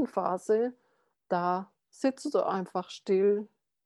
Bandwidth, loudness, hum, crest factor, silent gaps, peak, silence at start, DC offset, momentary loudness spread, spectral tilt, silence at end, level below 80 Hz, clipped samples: 12 kHz; -30 LUFS; none; 16 dB; none; -14 dBFS; 0 s; under 0.1%; 9 LU; -6.5 dB/octave; 0.4 s; -84 dBFS; under 0.1%